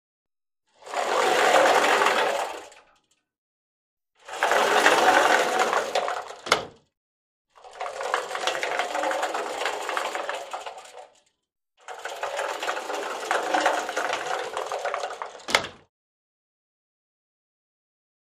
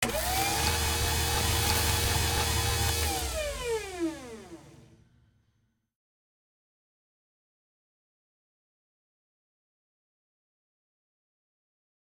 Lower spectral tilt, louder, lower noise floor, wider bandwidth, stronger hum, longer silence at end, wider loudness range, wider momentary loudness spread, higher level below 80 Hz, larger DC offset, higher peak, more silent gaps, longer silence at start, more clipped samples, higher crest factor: second, -1 dB/octave vs -3 dB/octave; first, -24 LUFS vs -28 LUFS; about the same, -73 dBFS vs -74 dBFS; second, 15.5 kHz vs 19.5 kHz; neither; second, 2.65 s vs 7.35 s; second, 10 LU vs 13 LU; first, 18 LU vs 9 LU; second, -70 dBFS vs -40 dBFS; neither; first, 0 dBFS vs -12 dBFS; first, 3.38-3.97 s, 6.97-7.45 s vs none; first, 0.85 s vs 0 s; neither; about the same, 26 dB vs 22 dB